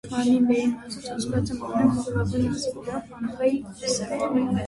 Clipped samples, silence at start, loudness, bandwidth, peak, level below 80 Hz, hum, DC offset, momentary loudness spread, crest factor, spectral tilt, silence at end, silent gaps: under 0.1%; 0.05 s; -25 LUFS; 11.5 kHz; -8 dBFS; -48 dBFS; none; under 0.1%; 12 LU; 16 dB; -5.5 dB/octave; 0 s; none